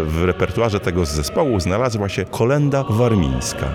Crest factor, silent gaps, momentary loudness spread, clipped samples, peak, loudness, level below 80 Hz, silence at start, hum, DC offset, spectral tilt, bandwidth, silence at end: 14 dB; none; 4 LU; under 0.1%; -4 dBFS; -19 LUFS; -32 dBFS; 0 s; none; under 0.1%; -6 dB/octave; 17.5 kHz; 0 s